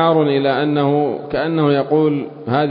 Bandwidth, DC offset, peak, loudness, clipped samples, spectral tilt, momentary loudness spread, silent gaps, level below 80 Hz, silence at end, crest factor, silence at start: 5.2 kHz; under 0.1%; -2 dBFS; -17 LUFS; under 0.1%; -12.5 dB/octave; 6 LU; none; -54 dBFS; 0 s; 14 dB; 0 s